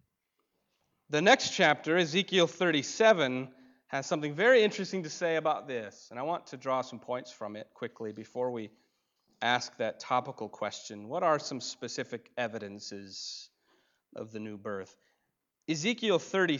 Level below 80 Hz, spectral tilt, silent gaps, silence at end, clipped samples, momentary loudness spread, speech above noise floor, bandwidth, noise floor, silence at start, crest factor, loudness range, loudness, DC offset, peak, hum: -80 dBFS; -4 dB/octave; none; 0 s; under 0.1%; 18 LU; 51 dB; 7.8 kHz; -81 dBFS; 1.1 s; 22 dB; 13 LU; -30 LUFS; under 0.1%; -10 dBFS; none